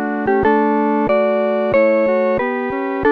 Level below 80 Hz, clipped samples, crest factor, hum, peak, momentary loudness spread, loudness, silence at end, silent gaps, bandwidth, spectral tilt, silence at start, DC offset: -46 dBFS; under 0.1%; 12 dB; none; -4 dBFS; 5 LU; -16 LUFS; 0 s; none; 5 kHz; -8.5 dB/octave; 0 s; under 0.1%